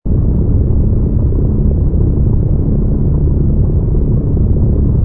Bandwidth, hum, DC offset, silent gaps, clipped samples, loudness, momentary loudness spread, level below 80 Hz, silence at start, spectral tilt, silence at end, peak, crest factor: 1.6 kHz; none; under 0.1%; none; under 0.1%; -14 LUFS; 1 LU; -14 dBFS; 0.05 s; -16 dB/octave; 0 s; 0 dBFS; 10 dB